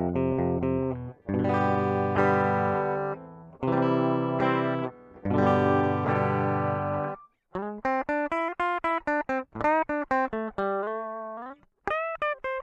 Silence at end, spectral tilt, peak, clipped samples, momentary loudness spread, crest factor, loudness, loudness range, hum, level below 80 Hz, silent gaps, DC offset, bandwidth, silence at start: 0 s; -8.5 dB/octave; -6 dBFS; under 0.1%; 12 LU; 20 dB; -27 LUFS; 3 LU; none; -56 dBFS; none; under 0.1%; 8.2 kHz; 0 s